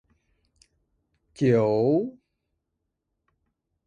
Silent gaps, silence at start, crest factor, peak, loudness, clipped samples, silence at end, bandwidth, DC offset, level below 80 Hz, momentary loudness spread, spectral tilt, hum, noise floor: none; 1.4 s; 20 dB; -8 dBFS; -23 LUFS; under 0.1%; 1.75 s; 10 kHz; under 0.1%; -66 dBFS; 6 LU; -8.5 dB/octave; none; -81 dBFS